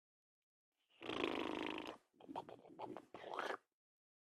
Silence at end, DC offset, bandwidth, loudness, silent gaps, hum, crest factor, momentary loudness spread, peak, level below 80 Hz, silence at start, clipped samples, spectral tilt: 0.75 s; under 0.1%; 13 kHz; -47 LUFS; none; none; 26 dB; 12 LU; -24 dBFS; -82 dBFS; 1 s; under 0.1%; -4.5 dB/octave